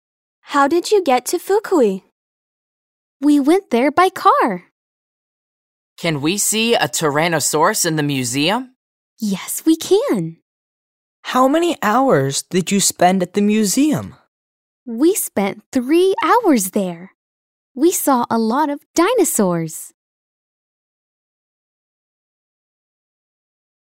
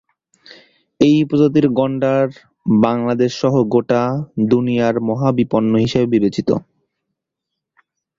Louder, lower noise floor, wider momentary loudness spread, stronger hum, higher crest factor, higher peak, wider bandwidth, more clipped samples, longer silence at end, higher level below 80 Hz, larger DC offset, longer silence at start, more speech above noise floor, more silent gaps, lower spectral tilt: about the same, -16 LUFS vs -16 LUFS; first, under -90 dBFS vs -80 dBFS; first, 9 LU vs 6 LU; neither; about the same, 18 dB vs 16 dB; about the same, 0 dBFS vs -2 dBFS; first, 16.5 kHz vs 7.6 kHz; neither; first, 3.95 s vs 1.6 s; second, -64 dBFS vs -52 dBFS; neither; second, 0.5 s vs 1 s; first, over 74 dB vs 65 dB; first, 2.12-3.20 s, 4.72-5.96 s, 8.76-9.17 s, 10.42-11.23 s, 14.28-14.86 s, 15.66-15.72 s, 17.15-17.75 s, 18.86-18.94 s vs none; second, -4 dB/octave vs -7.5 dB/octave